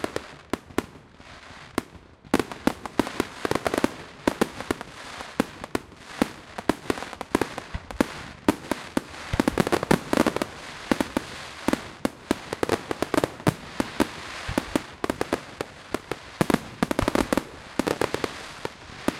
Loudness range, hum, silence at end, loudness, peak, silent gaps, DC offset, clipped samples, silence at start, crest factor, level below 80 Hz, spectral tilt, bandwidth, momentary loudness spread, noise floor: 4 LU; none; 0 s; -28 LUFS; -2 dBFS; none; under 0.1%; under 0.1%; 0 s; 26 dB; -46 dBFS; -5 dB/octave; 16.5 kHz; 12 LU; -48 dBFS